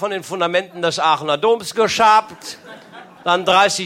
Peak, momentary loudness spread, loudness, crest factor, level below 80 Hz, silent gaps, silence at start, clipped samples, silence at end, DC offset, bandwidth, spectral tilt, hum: -2 dBFS; 18 LU; -16 LUFS; 16 dB; -60 dBFS; none; 0 s; under 0.1%; 0 s; under 0.1%; 16.5 kHz; -2.5 dB/octave; none